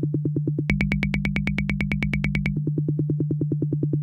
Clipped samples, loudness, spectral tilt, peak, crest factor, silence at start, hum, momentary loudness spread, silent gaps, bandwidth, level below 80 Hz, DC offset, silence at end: under 0.1%; -25 LUFS; -8 dB/octave; -6 dBFS; 18 dB; 0 s; none; 2 LU; none; 7.4 kHz; -36 dBFS; under 0.1%; 0 s